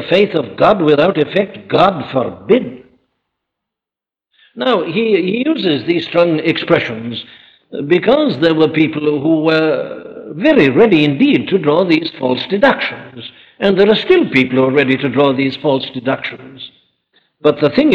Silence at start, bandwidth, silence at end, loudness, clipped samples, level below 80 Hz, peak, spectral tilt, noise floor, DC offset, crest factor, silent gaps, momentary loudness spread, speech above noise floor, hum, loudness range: 0 s; 7 kHz; 0 s; -13 LUFS; under 0.1%; -52 dBFS; 0 dBFS; -7.5 dB/octave; -87 dBFS; under 0.1%; 12 dB; none; 15 LU; 74 dB; none; 5 LU